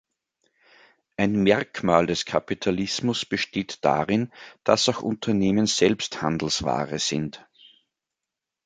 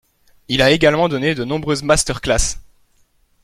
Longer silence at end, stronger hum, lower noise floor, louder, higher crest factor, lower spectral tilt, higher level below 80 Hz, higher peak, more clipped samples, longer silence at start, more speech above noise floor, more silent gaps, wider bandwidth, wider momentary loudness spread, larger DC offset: first, 1.25 s vs 0.8 s; neither; first, -87 dBFS vs -58 dBFS; second, -24 LUFS vs -16 LUFS; about the same, 22 dB vs 18 dB; about the same, -4.5 dB/octave vs -3.5 dB/octave; second, -54 dBFS vs -32 dBFS; about the same, -2 dBFS vs -2 dBFS; neither; first, 1.2 s vs 0.5 s; first, 63 dB vs 42 dB; neither; second, 9.4 kHz vs 15 kHz; about the same, 7 LU vs 9 LU; neither